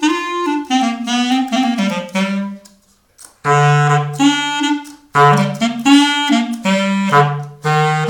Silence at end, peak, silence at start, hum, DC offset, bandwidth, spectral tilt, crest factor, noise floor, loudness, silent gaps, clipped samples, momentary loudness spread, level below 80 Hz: 0 s; 0 dBFS; 0 s; none; under 0.1%; 18 kHz; -5 dB/octave; 14 dB; -52 dBFS; -15 LUFS; none; under 0.1%; 8 LU; -60 dBFS